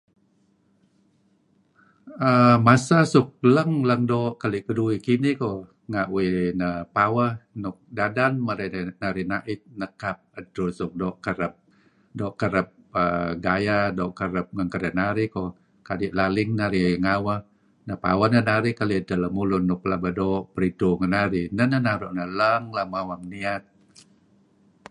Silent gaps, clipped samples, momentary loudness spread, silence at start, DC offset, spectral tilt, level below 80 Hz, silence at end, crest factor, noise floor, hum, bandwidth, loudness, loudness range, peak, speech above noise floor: none; under 0.1%; 12 LU; 2.05 s; under 0.1%; -7 dB/octave; -50 dBFS; 1.3 s; 22 dB; -64 dBFS; none; 11.5 kHz; -24 LUFS; 8 LU; -2 dBFS; 41 dB